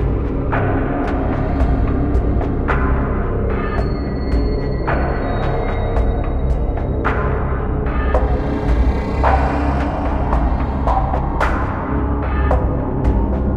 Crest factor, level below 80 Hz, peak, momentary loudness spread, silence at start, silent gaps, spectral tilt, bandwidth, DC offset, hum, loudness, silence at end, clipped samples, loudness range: 14 dB; -20 dBFS; -2 dBFS; 3 LU; 0 s; none; -9 dB/octave; 5.4 kHz; 0.2%; none; -19 LUFS; 0 s; under 0.1%; 2 LU